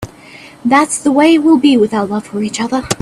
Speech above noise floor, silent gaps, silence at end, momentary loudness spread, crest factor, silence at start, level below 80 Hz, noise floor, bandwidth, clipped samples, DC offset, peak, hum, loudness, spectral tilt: 25 dB; none; 0.05 s; 10 LU; 12 dB; 0 s; -48 dBFS; -37 dBFS; 14 kHz; under 0.1%; under 0.1%; 0 dBFS; none; -12 LUFS; -4 dB/octave